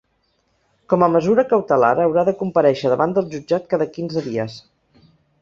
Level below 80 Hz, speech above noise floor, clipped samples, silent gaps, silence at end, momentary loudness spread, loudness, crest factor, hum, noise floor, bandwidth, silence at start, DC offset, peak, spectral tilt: -58 dBFS; 48 dB; under 0.1%; none; 0.8 s; 8 LU; -18 LUFS; 18 dB; none; -66 dBFS; 7.4 kHz; 0.9 s; under 0.1%; -2 dBFS; -7.5 dB/octave